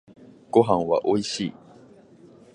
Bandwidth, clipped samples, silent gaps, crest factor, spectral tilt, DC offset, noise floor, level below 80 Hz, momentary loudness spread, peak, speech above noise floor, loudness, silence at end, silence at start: 10.5 kHz; under 0.1%; none; 22 dB; -5.5 dB/octave; under 0.1%; -51 dBFS; -60 dBFS; 10 LU; -4 dBFS; 29 dB; -23 LUFS; 1.05 s; 0.55 s